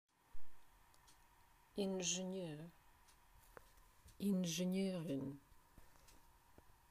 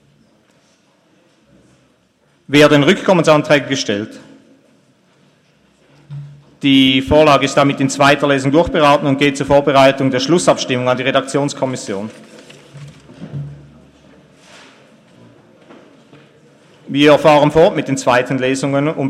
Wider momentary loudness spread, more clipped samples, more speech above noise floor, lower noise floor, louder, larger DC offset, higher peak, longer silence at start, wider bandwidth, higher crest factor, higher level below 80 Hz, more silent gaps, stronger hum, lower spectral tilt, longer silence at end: first, 24 LU vs 17 LU; neither; second, 28 dB vs 44 dB; first, -70 dBFS vs -56 dBFS; second, -43 LUFS vs -13 LUFS; neither; second, -28 dBFS vs 0 dBFS; second, 0.35 s vs 2.5 s; first, 15.5 kHz vs 13.5 kHz; about the same, 18 dB vs 16 dB; second, -70 dBFS vs -44 dBFS; neither; neither; about the same, -4.5 dB/octave vs -5 dB/octave; about the same, 0.05 s vs 0 s